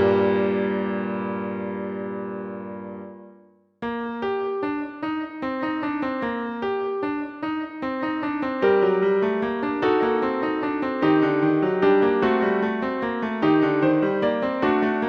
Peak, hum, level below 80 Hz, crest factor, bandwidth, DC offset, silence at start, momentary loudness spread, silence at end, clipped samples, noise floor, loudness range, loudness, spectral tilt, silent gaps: -8 dBFS; none; -58 dBFS; 16 dB; 6 kHz; under 0.1%; 0 s; 11 LU; 0 s; under 0.1%; -54 dBFS; 9 LU; -23 LUFS; -8.5 dB/octave; none